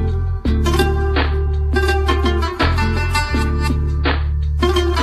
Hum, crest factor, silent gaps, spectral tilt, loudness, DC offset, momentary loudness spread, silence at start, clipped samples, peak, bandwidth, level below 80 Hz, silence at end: none; 14 dB; none; -6 dB/octave; -18 LUFS; under 0.1%; 3 LU; 0 s; under 0.1%; -4 dBFS; 13 kHz; -18 dBFS; 0 s